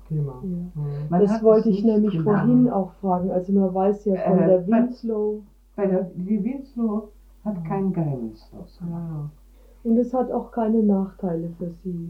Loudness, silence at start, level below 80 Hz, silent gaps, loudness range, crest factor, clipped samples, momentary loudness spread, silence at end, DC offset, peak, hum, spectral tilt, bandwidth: -23 LUFS; 0 s; -50 dBFS; none; 8 LU; 18 dB; under 0.1%; 14 LU; 0 s; under 0.1%; -4 dBFS; none; -10.5 dB/octave; 6.4 kHz